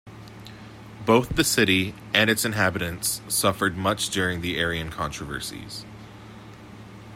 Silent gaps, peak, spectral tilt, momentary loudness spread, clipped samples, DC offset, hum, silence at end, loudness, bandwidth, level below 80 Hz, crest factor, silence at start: none; -2 dBFS; -3.5 dB/octave; 24 LU; under 0.1%; under 0.1%; none; 0 s; -23 LUFS; 16 kHz; -48 dBFS; 24 dB; 0.05 s